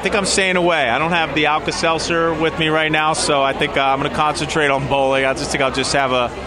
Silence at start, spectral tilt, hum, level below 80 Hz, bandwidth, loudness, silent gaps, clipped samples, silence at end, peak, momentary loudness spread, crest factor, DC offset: 0 s; -3.5 dB/octave; none; -40 dBFS; 14 kHz; -16 LUFS; none; under 0.1%; 0 s; -2 dBFS; 3 LU; 14 dB; under 0.1%